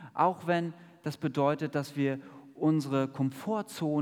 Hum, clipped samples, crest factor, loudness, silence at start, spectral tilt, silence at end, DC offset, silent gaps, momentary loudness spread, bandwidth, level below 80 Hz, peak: none; under 0.1%; 18 dB; -31 LUFS; 0 s; -7 dB/octave; 0 s; under 0.1%; none; 11 LU; 17 kHz; -84 dBFS; -12 dBFS